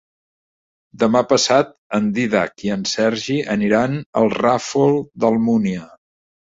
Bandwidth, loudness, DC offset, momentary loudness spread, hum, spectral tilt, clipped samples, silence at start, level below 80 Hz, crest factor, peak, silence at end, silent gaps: 7.8 kHz; -18 LUFS; under 0.1%; 7 LU; none; -5 dB/octave; under 0.1%; 0.95 s; -56 dBFS; 18 dB; -2 dBFS; 0.7 s; 1.78-1.90 s, 4.06-4.13 s